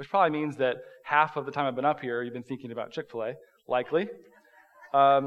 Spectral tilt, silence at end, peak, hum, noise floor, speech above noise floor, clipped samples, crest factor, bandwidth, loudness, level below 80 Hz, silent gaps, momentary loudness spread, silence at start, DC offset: -7 dB/octave; 0 s; -8 dBFS; none; -58 dBFS; 30 dB; under 0.1%; 20 dB; 7.8 kHz; -29 LUFS; -82 dBFS; none; 12 LU; 0 s; under 0.1%